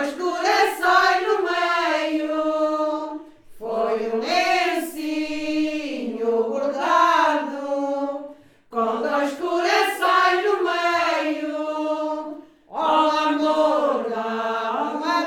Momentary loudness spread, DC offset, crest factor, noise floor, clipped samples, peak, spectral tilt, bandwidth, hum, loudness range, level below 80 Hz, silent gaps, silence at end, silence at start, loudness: 10 LU; under 0.1%; 18 dB; -43 dBFS; under 0.1%; -4 dBFS; -2.5 dB/octave; 19.5 kHz; none; 3 LU; -62 dBFS; none; 0 s; 0 s; -21 LUFS